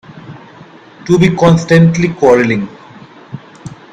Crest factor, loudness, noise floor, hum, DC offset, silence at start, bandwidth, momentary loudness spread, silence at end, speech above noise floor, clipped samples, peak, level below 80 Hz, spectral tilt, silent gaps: 12 dB; -10 LUFS; -37 dBFS; none; under 0.1%; 0.1 s; 8 kHz; 24 LU; 0.2 s; 28 dB; 0.1%; 0 dBFS; -44 dBFS; -7 dB/octave; none